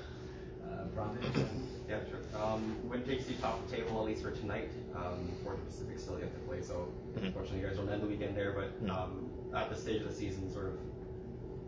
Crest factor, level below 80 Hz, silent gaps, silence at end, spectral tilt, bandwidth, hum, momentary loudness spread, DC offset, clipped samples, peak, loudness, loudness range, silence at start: 20 dB; -52 dBFS; none; 0 s; -6.5 dB/octave; 8 kHz; none; 7 LU; under 0.1%; under 0.1%; -20 dBFS; -40 LUFS; 3 LU; 0 s